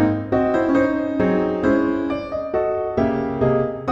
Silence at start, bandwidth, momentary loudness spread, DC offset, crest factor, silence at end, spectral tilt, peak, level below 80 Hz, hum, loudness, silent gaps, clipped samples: 0 s; 7.4 kHz; 5 LU; under 0.1%; 14 dB; 0 s; -9 dB/octave; -6 dBFS; -44 dBFS; none; -20 LUFS; none; under 0.1%